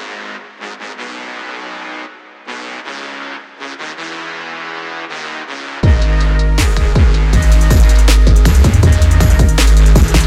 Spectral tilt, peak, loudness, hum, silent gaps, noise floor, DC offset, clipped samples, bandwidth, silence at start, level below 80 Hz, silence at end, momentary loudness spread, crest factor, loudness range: -5.5 dB/octave; -2 dBFS; -12 LUFS; none; none; -32 dBFS; under 0.1%; under 0.1%; 14 kHz; 0 s; -12 dBFS; 0 s; 18 LU; 10 dB; 16 LU